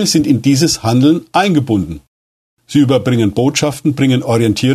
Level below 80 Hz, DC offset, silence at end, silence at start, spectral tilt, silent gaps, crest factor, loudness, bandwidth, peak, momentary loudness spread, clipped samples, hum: -44 dBFS; under 0.1%; 0 s; 0 s; -5.5 dB/octave; 2.08-2.57 s; 12 dB; -13 LUFS; 13.5 kHz; 0 dBFS; 5 LU; under 0.1%; none